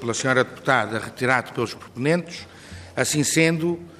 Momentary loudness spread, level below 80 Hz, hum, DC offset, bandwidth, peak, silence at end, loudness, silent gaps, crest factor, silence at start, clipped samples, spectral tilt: 16 LU; -60 dBFS; none; under 0.1%; 15.5 kHz; -4 dBFS; 0.05 s; -22 LUFS; none; 18 dB; 0 s; under 0.1%; -4 dB/octave